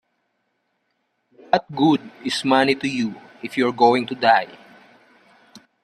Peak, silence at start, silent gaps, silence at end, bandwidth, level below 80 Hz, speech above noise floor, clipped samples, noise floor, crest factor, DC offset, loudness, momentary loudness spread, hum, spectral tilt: -2 dBFS; 1.55 s; none; 0.25 s; 13 kHz; -66 dBFS; 52 dB; under 0.1%; -72 dBFS; 20 dB; under 0.1%; -20 LUFS; 10 LU; none; -5 dB/octave